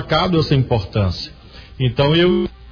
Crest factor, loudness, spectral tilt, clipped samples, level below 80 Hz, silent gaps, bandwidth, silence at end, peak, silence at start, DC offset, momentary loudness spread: 14 dB; -17 LUFS; -7.5 dB/octave; under 0.1%; -36 dBFS; none; 5.4 kHz; 0 s; -4 dBFS; 0 s; under 0.1%; 8 LU